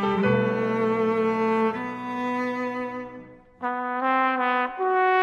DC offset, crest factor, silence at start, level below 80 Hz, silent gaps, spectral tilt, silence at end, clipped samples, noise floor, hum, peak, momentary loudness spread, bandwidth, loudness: under 0.1%; 16 dB; 0 s; -62 dBFS; none; -7.5 dB/octave; 0 s; under 0.1%; -45 dBFS; none; -8 dBFS; 10 LU; 8 kHz; -25 LUFS